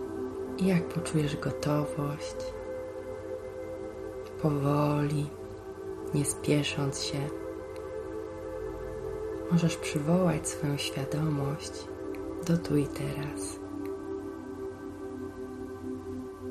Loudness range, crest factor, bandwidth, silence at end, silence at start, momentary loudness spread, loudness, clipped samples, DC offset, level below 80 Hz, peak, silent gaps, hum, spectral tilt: 4 LU; 20 dB; 13.5 kHz; 0 s; 0 s; 12 LU; -33 LUFS; under 0.1%; under 0.1%; -54 dBFS; -12 dBFS; none; none; -6 dB/octave